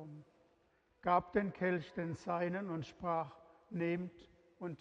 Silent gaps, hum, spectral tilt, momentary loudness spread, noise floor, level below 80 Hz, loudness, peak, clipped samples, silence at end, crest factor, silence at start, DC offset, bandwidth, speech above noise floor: none; none; -8 dB/octave; 14 LU; -74 dBFS; -70 dBFS; -39 LUFS; -18 dBFS; under 0.1%; 0.05 s; 22 dB; 0 s; under 0.1%; 7.8 kHz; 36 dB